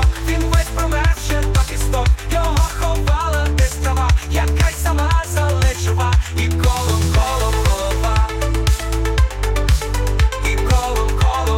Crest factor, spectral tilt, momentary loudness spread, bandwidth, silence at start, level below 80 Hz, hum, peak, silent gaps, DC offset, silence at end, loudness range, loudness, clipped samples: 12 dB; -5 dB/octave; 3 LU; 16.5 kHz; 0 s; -18 dBFS; none; -4 dBFS; none; under 0.1%; 0 s; 1 LU; -18 LUFS; under 0.1%